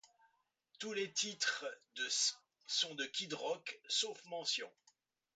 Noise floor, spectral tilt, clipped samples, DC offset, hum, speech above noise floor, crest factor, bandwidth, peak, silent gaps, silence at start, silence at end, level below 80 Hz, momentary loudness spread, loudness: -78 dBFS; 0 dB/octave; under 0.1%; under 0.1%; none; 37 dB; 20 dB; 9 kHz; -22 dBFS; none; 0.8 s; 0.65 s; under -90 dBFS; 9 LU; -39 LUFS